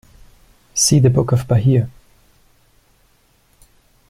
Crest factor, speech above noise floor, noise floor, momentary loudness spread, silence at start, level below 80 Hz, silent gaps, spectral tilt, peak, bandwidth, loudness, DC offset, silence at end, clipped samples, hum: 16 dB; 43 dB; -57 dBFS; 10 LU; 0.75 s; -44 dBFS; none; -5.5 dB/octave; -2 dBFS; 15 kHz; -15 LUFS; under 0.1%; 2.2 s; under 0.1%; none